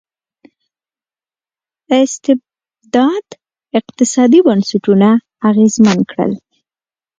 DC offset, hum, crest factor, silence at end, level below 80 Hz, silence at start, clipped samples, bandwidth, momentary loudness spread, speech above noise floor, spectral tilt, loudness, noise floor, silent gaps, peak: under 0.1%; none; 14 dB; 0.85 s; -58 dBFS; 1.9 s; under 0.1%; 9.4 kHz; 10 LU; over 79 dB; -5.5 dB/octave; -13 LUFS; under -90 dBFS; none; 0 dBFS